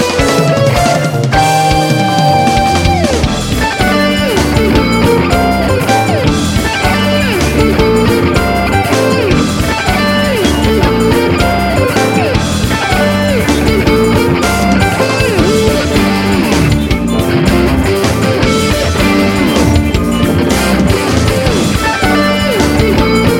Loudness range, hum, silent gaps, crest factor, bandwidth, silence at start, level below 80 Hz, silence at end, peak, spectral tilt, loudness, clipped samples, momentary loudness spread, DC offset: 1 LU; none; none; 10 dB; 17 kHz; 0 s; -22 dBFS; 0 s; 0 dBFS; -5 dB/octave; -10 LUFS; 0.2%; 2 LU; under 0.1%